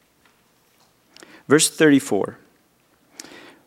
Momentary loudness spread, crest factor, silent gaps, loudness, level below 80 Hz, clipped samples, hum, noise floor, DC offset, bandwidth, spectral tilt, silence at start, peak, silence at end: 26 LU; 22 dB; none; -18 LUFS; -72 dBFS; under 0.1%; none; -61 dBFS; under 0.1%; 16 kHz; -3.5 dB/octave; 1.5 s; -2 dBFS; 1.35 s